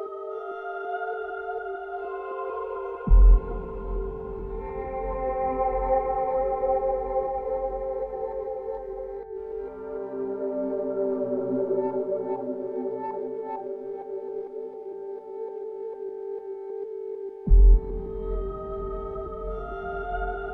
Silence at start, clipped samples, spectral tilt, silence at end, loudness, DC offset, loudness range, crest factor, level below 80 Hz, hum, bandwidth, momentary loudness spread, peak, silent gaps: 0 s; under 0.1%; -11 dB/octave; 0 s; -29 LUFS; under 0.1%; 7 LU; 18 dB; -28 dBFS; none; 3 kHz; 11 LU; -8 dBFS; none